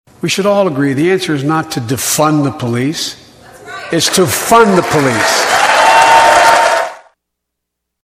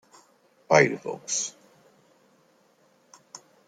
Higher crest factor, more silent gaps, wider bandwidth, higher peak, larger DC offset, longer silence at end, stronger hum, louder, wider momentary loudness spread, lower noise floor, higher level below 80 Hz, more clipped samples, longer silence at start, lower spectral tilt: second, 12 dB vs 26 dB; neither; first, 16 kHz vs 11 kHz; first, 0 dBFS vs -4 dBFS; neither; first, 1.1 s vs 0.3 s; neither; first, -10 LUFS vs -24 LUFS; second, 11 LU vs 27 LU; first, -75 dBFS vs -63 dBFS; first, -48 dBFS vs -76 dBFS; first, 0.3% vs under 0.1%; second, 0.25 s vs 0.7 s; about the same, -3.5 dB/octave vs -3.5 dB/octave